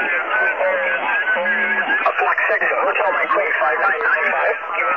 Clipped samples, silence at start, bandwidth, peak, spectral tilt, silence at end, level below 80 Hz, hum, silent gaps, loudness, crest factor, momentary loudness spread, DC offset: under 0.1%; 0 s; 7 kHz; -4 dBFS; -4 dB/octave; 0 s; -68 dBFS; none; none; -17 LUFS; 14 dB; 2 LU; 0.2%